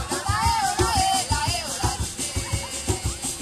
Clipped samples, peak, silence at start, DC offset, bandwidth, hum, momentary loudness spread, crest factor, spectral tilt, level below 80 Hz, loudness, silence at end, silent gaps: under 0.1%; -8 dBFS; 0 s; under 0.1%; 16 kHz; none; 6 LU; 16 dB; -3 dB/octave; -34 dBFS; -24 LUFS; 0 s; none